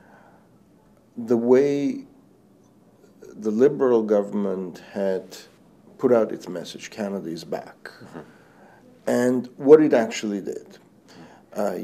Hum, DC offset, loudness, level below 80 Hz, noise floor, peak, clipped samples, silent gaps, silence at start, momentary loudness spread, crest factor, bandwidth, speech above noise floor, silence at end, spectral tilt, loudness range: none; under 0.1%; -22 LUFS; -72 dBFS; -56 dBFS; -2 dBFS; under 0.1%; none; 1.15 s; 22 LU; 22 dB; 14.5 kHz; 34 dB; 0 s; -6 dB/octave; 6 LU